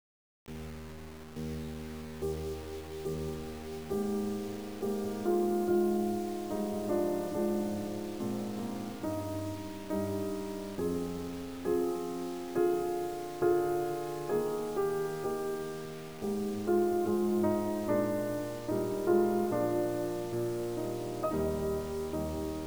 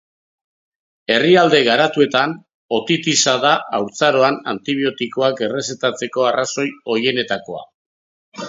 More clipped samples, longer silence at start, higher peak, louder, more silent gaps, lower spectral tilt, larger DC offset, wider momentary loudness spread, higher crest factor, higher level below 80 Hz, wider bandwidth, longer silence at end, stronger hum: neither; second, 0.45 s vs 1.1 s; second, -16 dBFS vs 0 dBFS; second, -34 LUFS vs -17 LUFS; second, none vs 2.54-2.69 s, 7.74-8.32 s; first, -6.5 dB/octave vs -3.5 dB/octave; first, 0.2% vs under 0.1%; about the same, 11 LU vs 10 LU; about the same, 18 dB vs 18 dB; first, -54 dBFS vs -66 dBFS; first, over 20 kHz vs 7.8 kHz; about the same, 0 s vs 0 s; neither